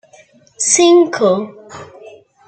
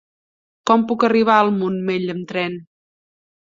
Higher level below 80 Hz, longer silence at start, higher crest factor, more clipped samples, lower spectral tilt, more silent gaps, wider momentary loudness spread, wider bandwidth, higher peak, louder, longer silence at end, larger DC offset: about the same, -66 dBFS vs -64 dBFS; about the same, 0.6 s vs 0.65 s; about the same, 16 dB vs 18 dB; neither; second, -3 dB/octave vs -6.5 dB/octave; neither; first, 25 LU vs 12 LU; first, 9.2 kHz vs 7.6 kHz; about the same, 0 dBFS vs -2 dBFS; first, -12 LUFS vs -18 LUFS; second, 0.4 s vs 0.9 s; neither